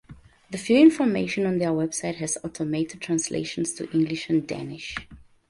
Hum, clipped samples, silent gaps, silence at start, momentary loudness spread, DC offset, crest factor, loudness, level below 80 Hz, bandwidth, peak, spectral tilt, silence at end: none; under 0.1%; none; 0.1 s; 16 LU; under 0.1%; 20 dB; -24 LUFS; -58 dBFS; 11.5 kHz; -6 dBFS; -5 dB/octave; 0.3 s